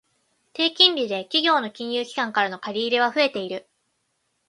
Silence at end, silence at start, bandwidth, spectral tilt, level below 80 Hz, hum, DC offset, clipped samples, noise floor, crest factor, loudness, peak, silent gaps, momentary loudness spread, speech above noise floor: 0.9 s; 0.55 s; 11.5 kHz; -3 dB/octave; -76 dBFS; none; under 0.1%; under 0.1%; -73 dBFS; 22 dB; -21 LUFS; -2 dBFS; none; 13 LU; 50 dB